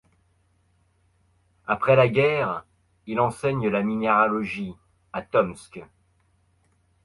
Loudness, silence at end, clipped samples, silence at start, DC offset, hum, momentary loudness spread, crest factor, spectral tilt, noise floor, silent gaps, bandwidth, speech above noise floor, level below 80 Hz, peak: -23 LUFS; 1.2 s; under 0.1%; 1.7 s; under 0.1%; none; 18 LU; 20 dB; -7 dB/octave; -65 dBFS; none; 11.5 kHz; 43 dB; -58 dBFS; -6 dBFS